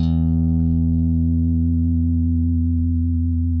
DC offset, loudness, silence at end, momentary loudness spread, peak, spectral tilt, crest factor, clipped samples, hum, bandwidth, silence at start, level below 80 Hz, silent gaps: under 0.1%; -19 LUFS; 0 s; 2 LU; -10 dBFS; -12.5 dB/octave; 8 dB; under 0.1%; none; 4 kHz; 0 s; -28 dBFS; none